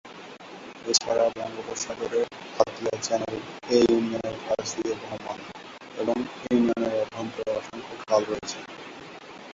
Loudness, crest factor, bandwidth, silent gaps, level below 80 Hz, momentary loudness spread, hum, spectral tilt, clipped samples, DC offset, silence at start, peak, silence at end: -27 LUFS; 24 dB; 8 kHz; none; -62 dBFS; 19 LU; none; -3.5 dB/octave; under 0.1%; under 0.1%; 0.05 s; -4 dBFS; 0 s